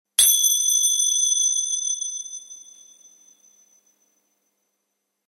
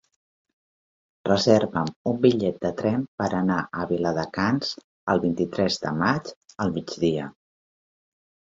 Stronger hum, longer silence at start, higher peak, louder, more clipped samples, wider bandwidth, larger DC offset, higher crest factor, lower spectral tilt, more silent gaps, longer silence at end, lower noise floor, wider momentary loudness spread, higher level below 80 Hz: neither; second, 0.2 s vs 1.25 s; about the same, -2 dBFS vs -4 dBFS; first, -17 LUFS vs -24 LUFS; neither; first, 16 kHz vs 7.8 kHz; neither; about the same, 22 dB vs 22 dB; second, 6 dB/octave vs -6 dB/octave; second, none vs 1.96-2.05 s, 3.08-3.18 s, 4.84-5.07 s, 6.36-6.41 s; first, 2.7 s vs 1.25 s; second, -77 dBFS vs under -90 dBFS; first, 19 LU vs 9 LU; second, -78 dBFS vs -56 dBFS